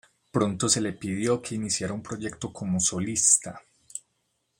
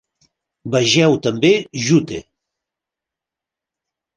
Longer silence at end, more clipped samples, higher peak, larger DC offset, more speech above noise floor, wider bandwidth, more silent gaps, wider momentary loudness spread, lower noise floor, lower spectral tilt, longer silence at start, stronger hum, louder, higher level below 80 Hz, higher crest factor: second, 0.6 s vs 1.95 s; neither; about the same, -4 dBFS vs -2 dBFS; neither; second, 48 dB vs 71 dB; first, 16 kHz vs 10 kHz; neither; first, 21 LU vs 16 LU; second, -75 dBFS vs -86 dBFS; about the same, -3.5 dB/octave vs -4.5 dB/octave; second, 0.35 s vs 0.65 s; neither; second, -25 LUFS vs -16 LUFS; second, -62 dBFS vs -56 dBFS; first, 24 dB vs 18 dB